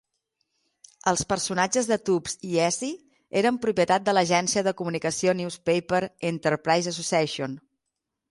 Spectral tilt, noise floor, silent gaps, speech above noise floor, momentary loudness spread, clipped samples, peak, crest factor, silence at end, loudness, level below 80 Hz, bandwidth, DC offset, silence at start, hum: -4 dB/octave; -83 dBFS; none; 59 dB; 8 LU; under 0.1%; -8 dBFS; 18 dB; 0.7 s; -25 LUFS; -60 dBFS; 11.5 kHz; under 0.1%; 1.05 s; none